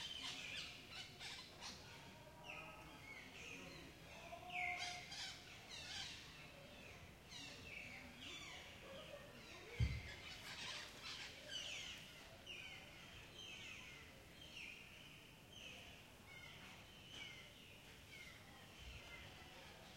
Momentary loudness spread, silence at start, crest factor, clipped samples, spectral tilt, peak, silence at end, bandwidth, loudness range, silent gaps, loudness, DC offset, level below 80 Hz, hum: 11 LU; 0 s; 24 dB; under 0.1%; -3 dB/octave; -30 dBFS; 0 s; 16 kHz; 7 LU; none; -53 LUFS; under 0.1%; -64 dBFS; none